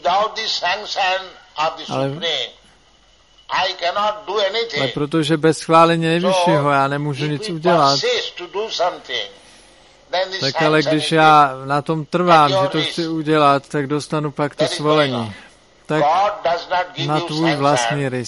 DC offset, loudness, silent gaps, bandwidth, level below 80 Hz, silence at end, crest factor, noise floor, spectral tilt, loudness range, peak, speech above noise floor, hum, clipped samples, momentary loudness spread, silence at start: under 0.1%; -17 LUFS; none; 11.5 kHz; -56 dBFS; 0 s; 18 dB; -53 dBFS; -5 dB/octave; 6 LU; 0 dBFS; 35 dB; none; under 0.1%; 10 LU; 0.05 s